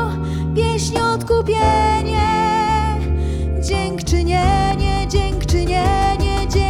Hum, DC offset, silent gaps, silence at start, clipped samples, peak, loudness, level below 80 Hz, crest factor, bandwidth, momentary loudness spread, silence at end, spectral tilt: none; under 0.1%; none; 0 s; under 0.1%; -4 dBFS; -18 LUFS; -22 dBFS; 14 dB; 13 kHz; 5 LU; 0 s; -5.5 dB/octave